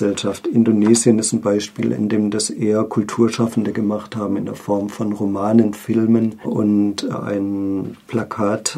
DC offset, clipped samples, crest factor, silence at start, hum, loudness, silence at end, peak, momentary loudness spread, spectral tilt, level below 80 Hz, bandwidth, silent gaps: under 0.1%; under 0.1%; 18 dB; 0 s; none; -19 LUFS; 0 s; 0 dBFS; 9 LU; -5.5 dB/octave; -62 dBFS; 14.5 kHz; none